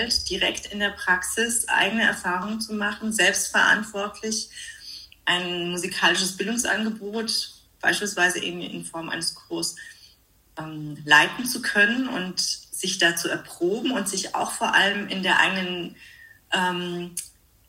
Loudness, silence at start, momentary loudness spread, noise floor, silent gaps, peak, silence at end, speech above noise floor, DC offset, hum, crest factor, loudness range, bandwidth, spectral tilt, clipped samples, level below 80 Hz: -23 LUFS; 0 s; 14 LU; -58 dBFS; none; -4 dBFS; 0.4 s; 34 dB; under 0.1%; none; 22 dB; 4 LU; 16 kHz; -2 dB/octave; under 0.1%; -56 dBFS